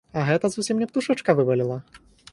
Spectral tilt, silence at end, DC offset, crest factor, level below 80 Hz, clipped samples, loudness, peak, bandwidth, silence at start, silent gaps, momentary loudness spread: -6 dB/octave; 0.35 s; under 0.1%; 18 dB; -60 dBFS; under 0.1%; -23 LUFS; -6 dBFS; 11.5 kHz; 0.15 s; none; 6 LU